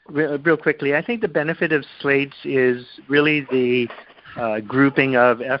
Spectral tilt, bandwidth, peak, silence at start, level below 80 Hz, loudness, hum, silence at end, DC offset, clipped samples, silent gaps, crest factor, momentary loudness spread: -10.5 dB/octave; 5.6 kHz; -2 dBFS; 0.1 s; -60 dBFS; -19 LUFS; none; 0 s; under 0.1%; under 0.1%; none; 18 dB; 9 LU